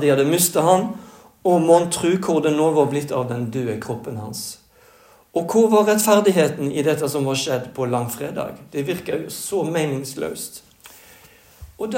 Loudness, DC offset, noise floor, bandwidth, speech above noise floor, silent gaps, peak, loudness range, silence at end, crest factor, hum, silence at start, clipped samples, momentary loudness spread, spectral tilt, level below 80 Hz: -20 LUFS; under 0.1%; -51 dBFS; 16.5 kHz; 32 dB; none; -2 dBFS; 7 LU; 0 s; 18 dB; none; 0 s; under 0.1%; 14 LU; -5 dB/octave; -58 dBFS